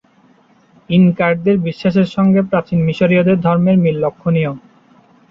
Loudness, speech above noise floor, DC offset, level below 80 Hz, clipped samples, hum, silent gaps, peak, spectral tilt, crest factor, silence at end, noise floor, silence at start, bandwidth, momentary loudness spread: -14 LUFS; 38 dB; under 0.1%; -50 dBFS; under 0.1%; none; none; -2 dBFS; -9.5 dB/octave; 14 dB; 0.75 s; -51 dBFS; 0.9 s; 5.8 kHz; 5 LU